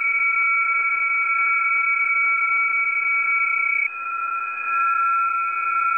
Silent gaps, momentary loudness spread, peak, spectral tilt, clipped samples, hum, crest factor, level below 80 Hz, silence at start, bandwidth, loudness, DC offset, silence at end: none; 6 LU; -12 dBFS; -1 dB/octave; under 0.1%; none; 10 dB; -76 dBFS; 0 s; 10 kHz; -19 LUFS; under 0.1%; 0 s